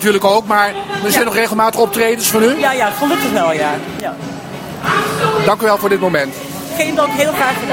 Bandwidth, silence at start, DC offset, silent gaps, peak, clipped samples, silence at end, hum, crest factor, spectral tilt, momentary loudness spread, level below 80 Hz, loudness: 16.5 kHz; 0 s; under 0.1%; none; 0 dBFS; under 0.1%; 0 s; none; 14 dB; -3.5 dB/octave; 11 LU; -50 dBFS; -14 LUFS